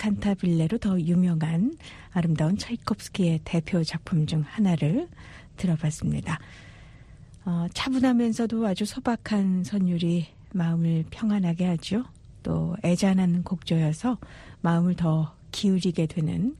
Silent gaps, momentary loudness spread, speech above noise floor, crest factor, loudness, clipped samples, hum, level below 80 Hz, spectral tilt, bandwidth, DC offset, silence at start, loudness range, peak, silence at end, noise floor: none; 8 LU; 23 dB; 14 dB; -26 LUFS; under 0.1%; none; -50 dBFS; -7 dB/octave; 11.5 kHz; under 0.1%; 0 s; 2 LU; -12 dBFS; 0 s; -48 dBFS